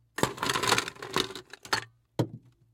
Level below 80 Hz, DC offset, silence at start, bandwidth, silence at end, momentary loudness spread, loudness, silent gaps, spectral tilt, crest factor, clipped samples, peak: -60 dBFS; under 0.1%; 0.2 s; 17 kHz; 0.35 s; 9 LU; -30 LUFS; none; -3 dB/octave; 26 dB; under 0.1%; -6 dBFS